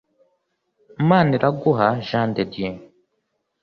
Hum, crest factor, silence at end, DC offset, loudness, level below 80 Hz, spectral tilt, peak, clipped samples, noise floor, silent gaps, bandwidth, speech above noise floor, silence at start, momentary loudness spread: none; 18 dB; 0.75 s; under 0.1%; -20 LUFS; -56 dBFS; -9 dB/octave; -4 dBFS; under 0.1%; -73 dBFS; none; 6.4 kHz; 54 dB; 1 s; 13 LU